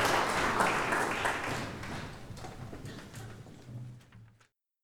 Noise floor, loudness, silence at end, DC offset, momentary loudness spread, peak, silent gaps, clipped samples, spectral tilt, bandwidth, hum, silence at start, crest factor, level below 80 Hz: -69 dBFS; -31 LUFS; 0.6 s; under 0.1%; 20 LU; -14 dBFS; none; under 0.1%; -3.5 dB/octave; over 20 kHz; none; 0 s; 22 dB; -54 dBFS